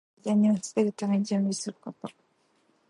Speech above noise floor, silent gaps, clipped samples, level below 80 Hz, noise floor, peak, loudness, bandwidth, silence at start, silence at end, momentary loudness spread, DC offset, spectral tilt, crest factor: 41 dB; none; under 0.1%; -78 dBFS; -68 dBFS; -12 dBFS; -27 LUFS; 11.5 kHz; 0.25 s; 0.8 s; 17 LU; under 0.1%; -6 dB/octave; 16 dB